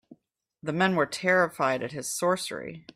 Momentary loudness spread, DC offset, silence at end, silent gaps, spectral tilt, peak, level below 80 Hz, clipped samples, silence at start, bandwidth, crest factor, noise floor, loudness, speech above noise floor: 11 LU; under 0.1%; 0.15 s; none; -4 dB/octave; -10 dBFS; -70 dBFS; under 0.1%; 0.1 s; 15.5 kHz; 18 dB; -67 dBFS; -26 LUFS; 40 dB